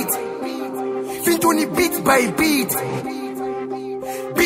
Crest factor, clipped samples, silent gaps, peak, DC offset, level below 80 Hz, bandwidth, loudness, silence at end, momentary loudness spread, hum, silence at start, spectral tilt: 18 dB; under 0.1%; none; -2 dBFS; under 0.1%; -52 dBFS; 16.5 kHz; -20 LUFS; 0 s; 11 LU; none; 0 s; -3.5 dB/octave